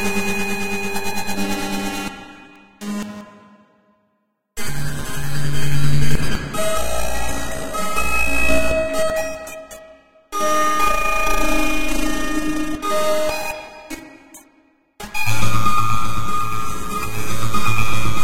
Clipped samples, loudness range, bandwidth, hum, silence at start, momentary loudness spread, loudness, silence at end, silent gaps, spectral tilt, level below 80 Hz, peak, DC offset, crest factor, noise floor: under 0.1%; 8 LU; 16 kHz; none; 0 s; 16 LU; -22 LUFS; 0 s; none; -4 dB/octave; -32 dBFS; 0 dBFS; under 0.1%; 14 dB; -68 dBFS